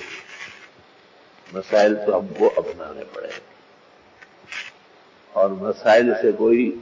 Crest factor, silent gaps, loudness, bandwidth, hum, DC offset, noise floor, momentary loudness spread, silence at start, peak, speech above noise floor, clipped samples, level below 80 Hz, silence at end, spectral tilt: 18 dB; none; -19 LUFS; 7.6 kHz; none; under 0.1%; -52 dBFS; 20 LU; 0 s; -6 dBFS; 32 dB; under 0.1%; -64 dBFS; 0 s; -5.5 dB/octave